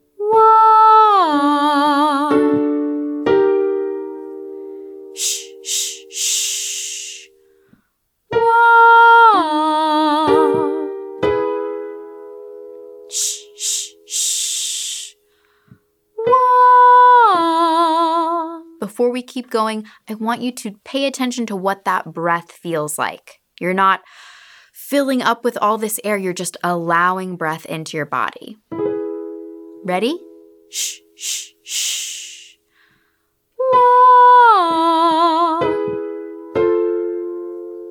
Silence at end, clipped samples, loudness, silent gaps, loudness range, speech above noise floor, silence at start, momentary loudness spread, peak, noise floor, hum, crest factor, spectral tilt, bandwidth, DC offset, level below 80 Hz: 0 s; under 0.1%; -15 LUFS; none; 11 LU; 48 dB; 0.2 s; 21 LU; -2 dBFS; -68 dBFS; none; 16 dB; -3 dB/octave; 19 kHz; under 0.1%; -60 dBFS